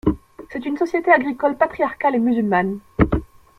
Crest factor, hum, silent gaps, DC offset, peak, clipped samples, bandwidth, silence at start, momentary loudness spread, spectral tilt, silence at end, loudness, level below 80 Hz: 18 dB; none; none; under 0.1%; -2 dBFS; under 0.1%; 11 kHz; 0.05 s; 11 LU; -8.5 dB/octave; 0.35 s; -20 LUFS; -36 dBFS